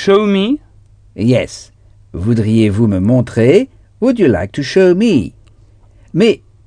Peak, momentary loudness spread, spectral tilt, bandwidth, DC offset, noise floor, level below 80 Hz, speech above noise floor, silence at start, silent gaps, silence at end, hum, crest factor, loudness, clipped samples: 0 dBFS; 11 LU; -7 dB/octave; 10 kHz; under 0.1%; -44 dBFS; -42 dBFS; 33 dB; 0 s; none; 0.3 s; none; 14 dB; -13 LUFS; under 0.1%